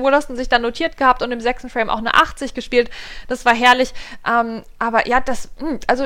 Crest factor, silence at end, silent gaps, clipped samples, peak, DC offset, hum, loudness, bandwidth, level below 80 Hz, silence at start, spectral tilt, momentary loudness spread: 18 dB; 0 s; none; under 0.1%; 0 dBFS; under 0.1%; none; -18 LUFS; 17 kHz; -36 dBFS; 0 s; -3 dB/octave; 13 LU